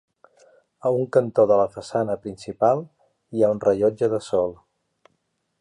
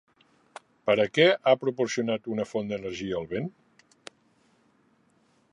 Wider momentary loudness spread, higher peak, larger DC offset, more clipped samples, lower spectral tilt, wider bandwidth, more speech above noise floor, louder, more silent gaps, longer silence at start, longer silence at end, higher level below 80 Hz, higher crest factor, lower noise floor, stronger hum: second, 10 LU vs 13 LU; about the same, -4 dBFS vs -6 dBFS; neither; neither; first, -7 dB/octave vs -5 dB/octave; about the same, 10.5 kHz vs 11 kHz; first, 51 dB vs 40 dB; first, -22 LUFS vs -26 LUFS; neither; about the same, 0.85 s vs 0.85 s; second, 1.05 s vs 2.05 s; about the same, -60 dBFS vs -64 dBFS; about the same, 20 dB vs 22 dB; first, -72 dBFS vs -66 dBFS; neither